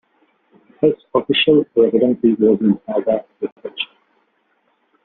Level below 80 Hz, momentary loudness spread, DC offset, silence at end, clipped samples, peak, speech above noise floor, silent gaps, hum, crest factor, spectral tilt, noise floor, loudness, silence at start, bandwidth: -60 dBFS; 13 LU; under 0.1%; 1.2 s; under 0.1%; -2 dBFS; 48 dB; 3.52-3.56 s; none; 16 dB; -4 dB/octave; -64 dBFS; -17 LUFS; 0.8 s; 4.2 kHz